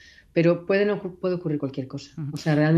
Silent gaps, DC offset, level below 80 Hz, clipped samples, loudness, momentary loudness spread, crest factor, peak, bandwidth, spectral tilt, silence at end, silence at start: none; under 0.1%; -62 dBFS; under 0.1%; -25 LUFS; 12 LU; 16 dB; -8 dBFS; 7.8 kHz; -8 dB/octave; 0 s; 0.35 s